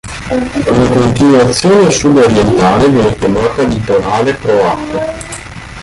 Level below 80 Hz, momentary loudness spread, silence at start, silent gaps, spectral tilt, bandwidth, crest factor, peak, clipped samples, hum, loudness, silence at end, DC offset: -30 dBFS; 10 LU; 0.05 s; none; -5.5 dB/octave; 11.5 kHz; 10 dB; 0 dBFS; under 0.1%; none; -10 LUFS; 0 s; under 0.1%